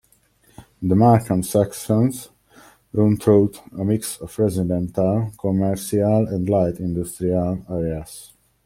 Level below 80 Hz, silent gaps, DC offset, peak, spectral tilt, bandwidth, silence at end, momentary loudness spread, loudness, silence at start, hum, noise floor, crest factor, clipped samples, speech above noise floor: -48 dBFS; none; under 0.1%; -2 dBFS; -7.5 dB/octave; 16 kHz; 0.4 s; 11 LU; -20 LUFS; 0.6 s; none; -58 dBFS; 18 dB; under 0.1%; 39 dB